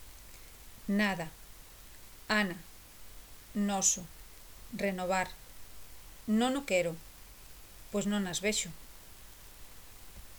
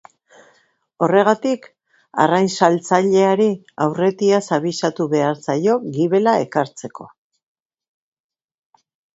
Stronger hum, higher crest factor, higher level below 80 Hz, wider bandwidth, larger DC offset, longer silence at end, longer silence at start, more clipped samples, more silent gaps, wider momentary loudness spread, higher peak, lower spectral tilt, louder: neither; about the same, 22 dB vs 18 dB; first, -56 dBFS vs -66 dBFS; first, over 20 kHz vs 8 kHz; neither; second, 0 s vs 2.1 s; second, 0 s vs 1 s; neither; neither; first, 22 LU vs 8 LU; second, -14 dBFS vs 0 dBFS; second, -3 dB/octave vs -5.5 dB/octave; second, -32 LUFS vs -18 LUFS